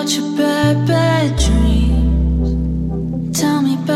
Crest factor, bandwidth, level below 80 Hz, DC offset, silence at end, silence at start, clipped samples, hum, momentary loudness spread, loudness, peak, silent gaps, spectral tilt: 12 dB; 15 kHz; -20 dBFS; under 0.1%; 0 s; 0 s; under 0.1%; none; 6 LU; -16 LUFS; -2 dBFS; none; -5.5 dB/octave